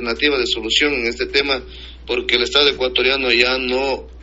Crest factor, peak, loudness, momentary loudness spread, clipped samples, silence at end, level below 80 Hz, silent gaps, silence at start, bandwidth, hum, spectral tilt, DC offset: 18 dB; 0 dBFS; -16 LUFS; 9 LU; under 0.1%; 0 s; -38 dBFS; none; 0 s; 8 kHz; none; 0 dB/octave; under 0.1%